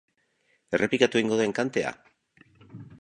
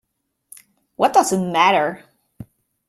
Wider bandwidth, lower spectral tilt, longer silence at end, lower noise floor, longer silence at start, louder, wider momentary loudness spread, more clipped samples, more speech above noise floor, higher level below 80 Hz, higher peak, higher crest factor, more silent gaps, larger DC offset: second, 10.5 kHz vs 15 kHz; about the same, -4.5 dB/octave vs -4 dB/octave; second, 0.05 s vs 0.45 s; second, -70 dBFS vs -74 dBFS; second, 0.7 s vs 1 s; second, -26 LUFS vs -17 LUFS; first, 17 LU vs 9 LU; neither; second, 45 dB vs 57 dB; about the same, -66 dBFS vs -62 dBFS; second, -6 dBFS vs -2 dBFS; about the same, 24 dB vs 20 dB; neither; neither